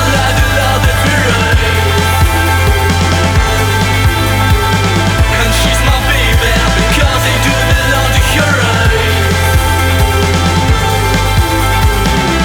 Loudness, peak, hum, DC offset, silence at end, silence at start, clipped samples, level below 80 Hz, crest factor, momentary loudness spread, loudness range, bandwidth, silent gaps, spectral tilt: -10 LUFS; 0 dBFS; none; under 0.1%; 0 s; 0 s; under 0.1%; -16 dBFS; 10 dB; 1 LU; 1 LU; over 20 kHz; none; -4.5 dB/octave